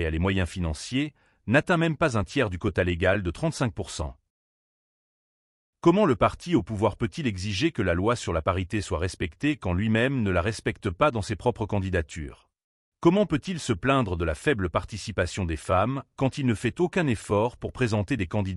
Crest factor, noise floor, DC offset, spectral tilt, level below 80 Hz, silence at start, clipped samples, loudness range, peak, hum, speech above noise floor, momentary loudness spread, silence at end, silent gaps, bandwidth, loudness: 18 dB; under -90 dBFS; under 0.1%; -6 dB/octave; -44 dBFS; 0 s; under 0.1%; 2 LU; -8 dBFS; none; over 64 dB; 7 LU; 0 s; 4.30-5.73 s, 12.64-12.92 s; 12 kHz; -26 LUFS